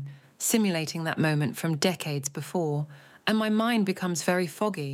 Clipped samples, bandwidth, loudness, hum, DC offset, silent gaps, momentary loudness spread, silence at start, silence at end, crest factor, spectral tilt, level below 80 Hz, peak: under 0.1%; 17 kHz; -27 LUFS; none; under 0.1%; none; 7 LU; 0 s; 0 s; 18 dB; -4.5 dB/octave; -76 dBFS; -10 dBFS